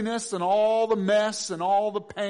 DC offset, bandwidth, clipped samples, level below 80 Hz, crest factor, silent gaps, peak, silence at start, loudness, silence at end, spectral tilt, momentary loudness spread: under 0.1%; 10.5 kHz; under 0.1%; -68 dBFS; 12 dB; none; -14 dBFS; 0 s; -24 LUFS; 0 s; -4 dB/octave; 6 LU